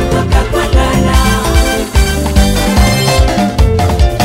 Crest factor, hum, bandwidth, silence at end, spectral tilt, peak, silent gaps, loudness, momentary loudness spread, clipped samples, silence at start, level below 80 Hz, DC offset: 10 dB; none; 16.5 kHz; 0 s; -5 dB/octave; 0 dBFS; none; -11 LUFS; 2 LU; 0.5%; 0 s; -12 dBFS; under 0.1%